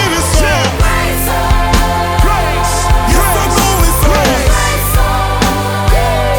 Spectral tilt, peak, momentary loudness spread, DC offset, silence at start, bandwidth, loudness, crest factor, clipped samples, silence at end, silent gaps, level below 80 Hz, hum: -4 dB/octave; 0 dBFS; 3 LU; under 0.1%; 0 s; 19.5 kHz; -12 LUFS; 10 dB; under 0.1%; 0 s; none; -14 dBFS; none